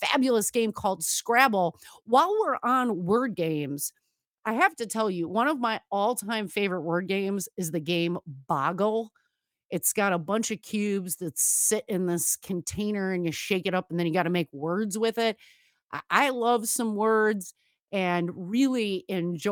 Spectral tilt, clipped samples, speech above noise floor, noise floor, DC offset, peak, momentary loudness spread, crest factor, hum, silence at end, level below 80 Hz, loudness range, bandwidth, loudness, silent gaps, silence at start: -3.5 dB/octave; under 0.1%; 35 dB; -62 dBFS; under 0.1%; -6 dBFS; 8 LU; 22 dB; none; 0 s; -68 dBFS; 4 LU; 19 kHz; -27 LUFS; 4.27-4.32 s, 4.39-4.43 s, 9.65-9.69 s, 15.84-15.88 s, 17.82-17.86 s; 0 s